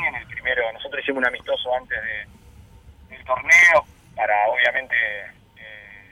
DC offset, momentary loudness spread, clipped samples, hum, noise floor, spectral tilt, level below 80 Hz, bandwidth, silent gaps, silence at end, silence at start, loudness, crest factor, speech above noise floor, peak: under 0.1%; 20 LU; under 0.1%; none; -47 dBFS; -2 dB/octave; -52 dBFS; 19.5 kHz; none; 0.1 s; 0 s; -19 LUFS; 16 dB; 27 dB; -6 dBFS